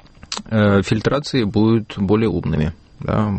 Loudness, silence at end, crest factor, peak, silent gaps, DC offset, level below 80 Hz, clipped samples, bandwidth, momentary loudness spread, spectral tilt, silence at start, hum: -18 LUFS; 0 s; 14 dB; -4 dBFS; none; under 0.1%; -38 dBFS; under 0.1%; 8.8 kHz; 10 LU; -7 dB/octave; 0.3 s; none